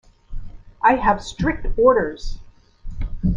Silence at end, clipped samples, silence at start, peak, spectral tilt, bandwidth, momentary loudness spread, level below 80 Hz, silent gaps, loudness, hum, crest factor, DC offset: 0 s; under 0.1%; 0.3 s; -2 dBFS; -6.5 dB/octave; 7.8 kHz; 24 LU; -30 dBFS; none; -19 LUFS; none; 18 dB; under 0.1%